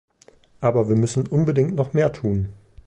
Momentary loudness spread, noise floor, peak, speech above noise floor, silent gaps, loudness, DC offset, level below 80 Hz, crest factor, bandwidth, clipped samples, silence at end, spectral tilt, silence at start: 5 LU; -53 dBFS; -6 dBFS; 34 dB; none; -21 LUFS; under 0.1%; -46 dBFS; 16 dB; 10.5 kHz; under 0.1%; 0.35 s; -8 dB/octave; 0.6 s